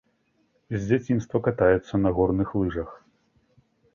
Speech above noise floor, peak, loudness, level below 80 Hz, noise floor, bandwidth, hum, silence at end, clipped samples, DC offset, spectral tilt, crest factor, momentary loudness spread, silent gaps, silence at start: 45 dB; -6 dBFS; -25 LUFS; -46 dBFS; -68 dBFS; 7.2 kHz; none; 1 s; under 0.1%; under 0.1%; -8.5 dB/octave; 20 dB; 11 LU; none; 0.7 s